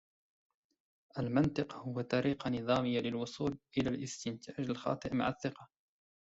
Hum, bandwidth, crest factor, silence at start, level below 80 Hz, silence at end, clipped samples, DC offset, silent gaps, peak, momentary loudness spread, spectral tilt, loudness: none; 8 kHz; 18 dB; 1.15 s; -64 dBFS; 0.65 s; under 0.1%; under 0.1%; none; -18 dBFS; 9 LU; -6 dB/octave; -36 LUFS